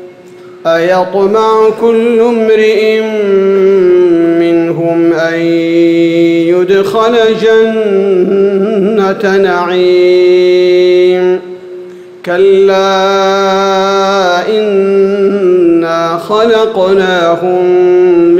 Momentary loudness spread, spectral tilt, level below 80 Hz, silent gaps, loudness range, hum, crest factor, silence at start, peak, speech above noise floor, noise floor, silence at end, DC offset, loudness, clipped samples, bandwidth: 4 LU; -6 dB/octave; -52 dBFS; none; 1 LU; none; 8 dB; 0 s; 0 dBFS; 24 dB; -32 dBFS; 0 s; under 0.1%; -8 LUFS; under 0.1%; 8.8 kHz